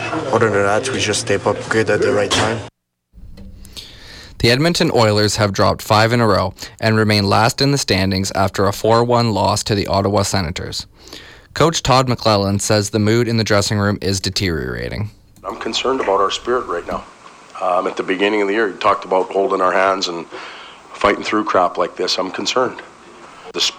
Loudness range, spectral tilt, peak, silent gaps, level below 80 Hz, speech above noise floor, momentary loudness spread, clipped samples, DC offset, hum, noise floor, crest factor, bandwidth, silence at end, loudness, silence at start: 4 LU; -4.5 dB/octave; -4 dBFS; none; -44 dBFS; 33 dB; 16 LU; under 0.1%; under 0.1%; none; -50 dBFS; 14 dB; 16.5 kHz; 0 s; -16 LUFS; 0 s